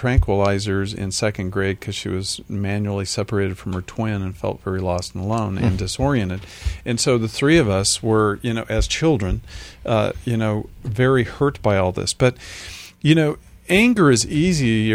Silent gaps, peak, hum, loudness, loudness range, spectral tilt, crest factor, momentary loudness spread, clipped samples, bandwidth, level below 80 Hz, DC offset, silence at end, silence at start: none; -2 dBFS; none; -20 LUFS; 5 LU; -5 dB/octave; 18 dB; 11 LU; under 0.1%; 15.5 kHz; -34 dBFS; under 0.1%; 0 s; 0 s